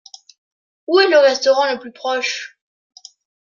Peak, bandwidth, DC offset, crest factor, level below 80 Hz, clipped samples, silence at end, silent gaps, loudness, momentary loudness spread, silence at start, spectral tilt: -2 dBFS; 7.4 kHz; under 0.1%; 18 dB; -76 dBFS; under 0.1%; 0.95 s; none; -16 LUFS; 16 LU; 0.9 s; -1 dB/octave